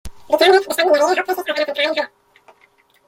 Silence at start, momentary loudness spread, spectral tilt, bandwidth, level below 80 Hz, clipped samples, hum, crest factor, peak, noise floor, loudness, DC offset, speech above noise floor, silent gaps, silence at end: 0.05 s; 9 LU; -2 dB/octave; 16.5 kHz; -50 dBFS; under 0.1%; none; 18 dB; -2 dBFS; -56 dBFS; -16 LUFS; under 0.1%; 40 dB; none; 1 s